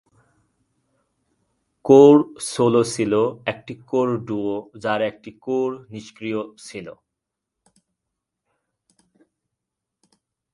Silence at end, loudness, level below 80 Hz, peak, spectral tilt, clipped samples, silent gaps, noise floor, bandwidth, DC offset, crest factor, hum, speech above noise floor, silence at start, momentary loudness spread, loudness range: 3.6 s; -19 LUFS; -64 dBFS; 0 dBFS; -6 dB/octave; under 0.1%; none; -83 dBFS; 11.5 kHz; under 0.1%; 22 dB; none; 63 dB; 1.85 s; 23 LU; 18 LU